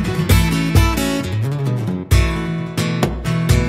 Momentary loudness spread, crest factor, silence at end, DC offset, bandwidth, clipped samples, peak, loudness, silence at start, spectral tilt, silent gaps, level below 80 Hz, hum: 6 LU; 16 dB; 0 s; under 0.1%; 16 kHz; under 0.1%; -2 dBFS; -18 LUFS; 0 s; -5.5 dB/octave; none; -22 dBFS; none